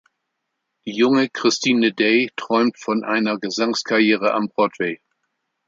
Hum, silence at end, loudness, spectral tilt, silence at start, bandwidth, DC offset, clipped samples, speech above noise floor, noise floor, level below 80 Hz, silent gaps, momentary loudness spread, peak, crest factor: none; 0.75 s; -19 LUFS; -4 dB/octave; 0.85 s; 7.6 kHz; under 0.1%; under 0.1%; 58 dB; -77 dBFS; -70 dBFS; none; 8 LU; -4 dBFS; 18 dB